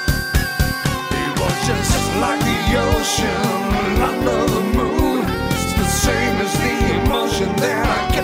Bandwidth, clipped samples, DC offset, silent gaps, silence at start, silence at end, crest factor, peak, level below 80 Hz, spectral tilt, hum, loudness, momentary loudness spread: 16.5 kHz; under 0.1%; under 0.1%; none; 0 s; 0 s; 14 dB; -4 dBFS; -26 dBFS; -4.5 dB/octave; none; -18 LUFS; 3 LU